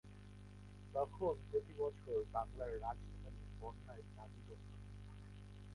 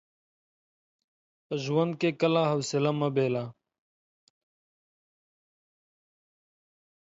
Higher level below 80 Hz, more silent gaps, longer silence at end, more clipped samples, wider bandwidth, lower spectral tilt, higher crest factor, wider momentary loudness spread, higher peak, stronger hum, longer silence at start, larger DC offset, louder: first, -58 dBFS vs -78 dBFS; neither; second, 0 s vs 3.5 s; neither; first, 11.5 kHz vs 8 kHz; first, -8 dB/octave vs -6 dB/octave; about the same, 18 dB vs 20 dB; first, 17 LU vs 9 LU; second, -28 dBFS vs -12 dBFS; first, 50 Hz at -55 dBFS vs none; second, 0.05 s vs 1.5 s; neither; second, -46 LUFS vs -28 LUFS